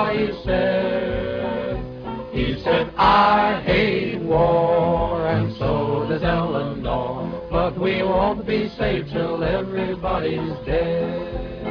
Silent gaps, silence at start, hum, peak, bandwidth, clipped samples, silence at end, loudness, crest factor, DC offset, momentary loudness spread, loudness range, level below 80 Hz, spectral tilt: none; 0 s; none; -4 dBFS; 5.4 kHz; under 0.1%; 0 s; -21 LUFS; 16 dB; under 0.1%; 9 LU; 4 LU; -36 dBFS; -8.5 dB/octave